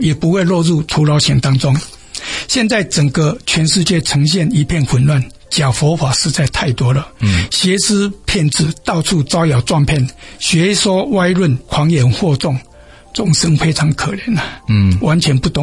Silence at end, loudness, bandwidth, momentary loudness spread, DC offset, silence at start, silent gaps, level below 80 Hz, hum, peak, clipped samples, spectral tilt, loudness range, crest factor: 0 s; -14 LUFS; 11.5 kHz; 6 LU; under 0.1%; 0 s; none; -34 dBFS; none; -2 dBFS; under 0.1%; -5 dB/octave; 1 LU; 12 dB